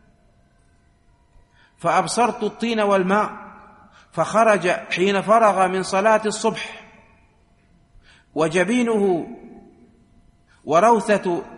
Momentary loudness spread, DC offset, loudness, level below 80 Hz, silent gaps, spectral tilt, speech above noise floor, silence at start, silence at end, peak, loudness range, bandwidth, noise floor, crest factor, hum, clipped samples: 16 LU; under 0.1%; -19 LUFS; -58 dBFS; none; -4.5 dB/octave; 39 dB; 1.8 s; 0 s; -4 dBFS; 5 LU; 11.5 kHz; -58 dBFS; 18 dB; none; under 0.1%